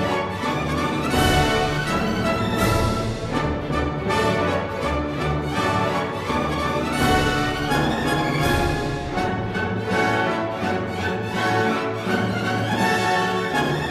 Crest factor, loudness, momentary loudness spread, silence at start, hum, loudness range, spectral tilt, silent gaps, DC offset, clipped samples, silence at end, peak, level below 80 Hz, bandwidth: 16 dB; -22 LUFS; 5 LU; 0 s; none; 2 LU; -5 dB/octave; none; under 0.1%; under 0.1%; 0 s; -6 dBFS; -36 dBFS; 14 kHz